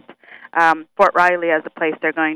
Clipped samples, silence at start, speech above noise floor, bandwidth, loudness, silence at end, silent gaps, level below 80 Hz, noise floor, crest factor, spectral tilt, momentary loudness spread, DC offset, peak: under 0.1%; 0.1 s; 26 dB; 14 kHz; -17 LUFS; 0 s; none; -62 dBFS; -42 dBFS; 16 dB; -5 dB/octave; 7 LU; under 0.1%; -2 dBFS